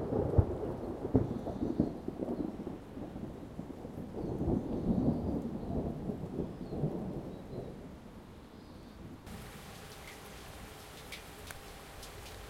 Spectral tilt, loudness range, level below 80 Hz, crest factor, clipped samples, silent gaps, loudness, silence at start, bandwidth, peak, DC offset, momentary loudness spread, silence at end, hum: -7.5 dB/octave; 12 LU; -48 dBFS; 24 dB; under 0.1%; none; -38 LUFS; 0 s; 16.5 kHz; -12 dBFS; under 0.1%; 17 LU; 0 s; none